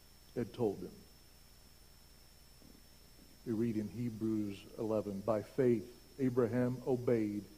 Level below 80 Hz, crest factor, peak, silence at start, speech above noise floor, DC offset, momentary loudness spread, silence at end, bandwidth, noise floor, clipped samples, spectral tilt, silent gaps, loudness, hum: -64 dBFS; 20 dB; -18 dBFS; 0.3 s; 25 dB; under 0.1%; 13 LU; 0 s; 15.5 kHz; -61 dBFS; under 0.1%; -8 dB/octave; none; -37 LUFS; none